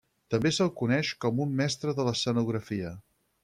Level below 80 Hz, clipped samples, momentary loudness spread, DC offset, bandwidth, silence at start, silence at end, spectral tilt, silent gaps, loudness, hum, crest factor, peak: -62 dBFS; under 0.1%; 9 LU; under 0.1%; 13.5 kHz; 0.3 s; 0.45 s; -5.5 dB/octave; none; -29 LUFS; none; 16 dB; -14 dBFS